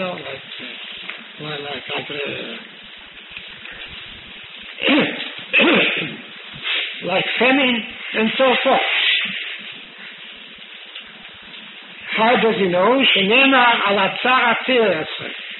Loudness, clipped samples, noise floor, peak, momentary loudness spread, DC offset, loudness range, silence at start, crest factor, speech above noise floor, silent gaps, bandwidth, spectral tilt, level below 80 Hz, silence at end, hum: -17 LUFS; under 0.1%; -39 dBFS; -2 dBFS; 21 LU; under 0.1%; 14 LU; 0 s; 18 dB; 22 dB; none; 4.2 kHz; -1 dB/octave; -62 dBFS; 0 s; none